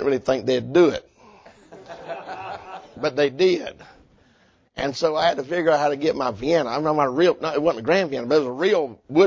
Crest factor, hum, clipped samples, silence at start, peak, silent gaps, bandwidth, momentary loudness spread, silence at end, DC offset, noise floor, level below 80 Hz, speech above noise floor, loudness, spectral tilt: 18 dB; none; under 0.1%; 0 s; -4 dBFS; none; 7.6 kHz; 16 LU; 0 s; under 0.1%; -59 dBFS; -56 dBFS; 39 dB; -21 LUFS; -5.5 dB/octave